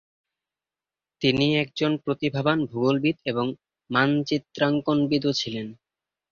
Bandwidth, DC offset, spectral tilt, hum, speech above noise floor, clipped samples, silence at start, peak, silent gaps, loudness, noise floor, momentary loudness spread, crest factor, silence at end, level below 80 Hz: 7.2 kHz; under 0.1%; -6 dB/octave; none; over 66 dB; under 0.1%; 1.2 s; -6 dBFS; none; -24 LUFS; under -90 dBFS; 7 LU; 20 dB; 0.55 s; -60 dBFS